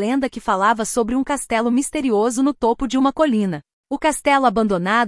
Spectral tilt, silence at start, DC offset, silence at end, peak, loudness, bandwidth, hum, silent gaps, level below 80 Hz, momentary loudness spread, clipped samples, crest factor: -4.5 dB/octave; 0 s; under 0.1%; 0 s; -4 dBFS; -19 LUFS; 12 kHz; none; 3.73-3.84 s; -46 dBFS; 5 LU; under 0.1%; 14 dB